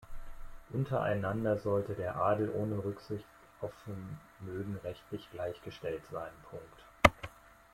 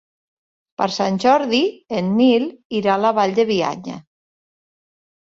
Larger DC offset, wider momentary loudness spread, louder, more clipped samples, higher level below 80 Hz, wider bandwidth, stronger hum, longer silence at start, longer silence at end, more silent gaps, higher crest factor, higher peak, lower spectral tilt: neither; first, 20 LU vs 12 LU; second, -35 LUFS vs -18 LUFS; neither; first, -52 dBFS vs -62 dBFS; first, 16 kHz vs 7.8 kHz; neither; second, 0 s vs 0.8 s; second, 0.25 s vs 1.4 s; second, none vs 2.65-2.70 s; first, 32 dB vs 16 dB; about the same, -4 dBFS vs -4 dBFS; about the same, -6 dB/octave vs -5.5 dB/octave